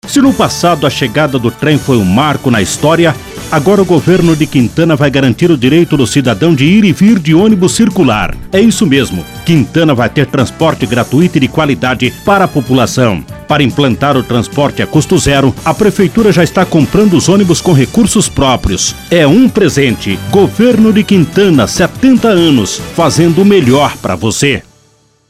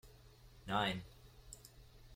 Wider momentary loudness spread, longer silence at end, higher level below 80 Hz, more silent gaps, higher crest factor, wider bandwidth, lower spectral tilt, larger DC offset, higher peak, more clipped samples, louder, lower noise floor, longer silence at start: second, 5 LU vs 26 LU; first, 0.7 s vs 0 s; first, -32 dBFS vs -62 dBFS; neither; second, 8 dB vs 22 dB; about the same, 15.5 kHz vs 16.5 kHz; about the same, -5.5 dB/octave vs -4.5 dB/octave; neither; first, 0 dBFS vs -24 dBFS; first, 0.8% vs under 0.1%; first, -9 LUFS vs -39 LUFS; second, -49 dBFS vs -61 dBFS; about the same, 0.05 s vs 0.05 s